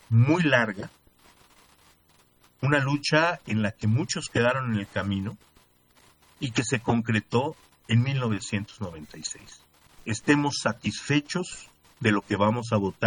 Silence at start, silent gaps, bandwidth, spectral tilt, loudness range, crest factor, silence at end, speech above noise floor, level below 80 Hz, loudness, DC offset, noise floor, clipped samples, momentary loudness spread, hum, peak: 0.1 s; none; 11 kHz; -5.5 dB/octave; 3 LU; 20 dB; 0 s; 36 dB; -60 dBFS; -26 LUFS; under 0.1%; -62 dBFS; under 0.1%; 14 LU; none; -6 dBFS